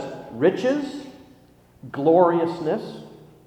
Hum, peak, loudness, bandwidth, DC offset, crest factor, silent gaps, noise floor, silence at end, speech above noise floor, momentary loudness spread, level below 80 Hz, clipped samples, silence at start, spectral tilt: 60 Hz at -50 dBFS; -4 dBFS; -22 LUFS; 9.4 kHz; under 0.1%; 20 dB; none; -53 dBFS; 0.35 s; 32 dB; 20 LU; -64 dBFS; under 0.1%; 0 s; -7 dB/octave